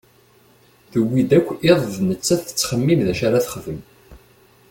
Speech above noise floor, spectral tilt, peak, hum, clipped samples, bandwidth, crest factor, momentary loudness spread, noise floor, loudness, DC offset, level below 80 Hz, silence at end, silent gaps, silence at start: 35 dB; -5.5 dB/octave; -2 dBFS; none; under 0.1%; 17 kHz; 18 dB; 10 LU; -54 dBFS; -19 LUFS; under 0.1%; -50 dBFS; 0.55 s; none; 0.95 s